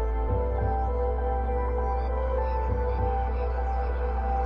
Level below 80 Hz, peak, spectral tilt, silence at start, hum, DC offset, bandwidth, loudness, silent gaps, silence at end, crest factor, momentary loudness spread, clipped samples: -28 dBFS; -14 dBFS; -10 dB/octave; 0 s; none; under 0.1%; 3.5 kHz; -28 LUFS; none; 0 s; 12 dB; 2 LU; under 0.1%